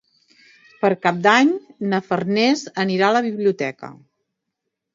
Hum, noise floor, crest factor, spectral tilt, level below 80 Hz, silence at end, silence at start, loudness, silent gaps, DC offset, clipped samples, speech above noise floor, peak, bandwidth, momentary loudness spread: none; -79 dBFS; 20 dB; -5 dB/octave; -70 dBFS; 1 s; 0.8 s; -19 LUFS; none; under 0.1%; under 0.1%; 61 dB; 0 dBFS; 7.8 kHz; 11 LU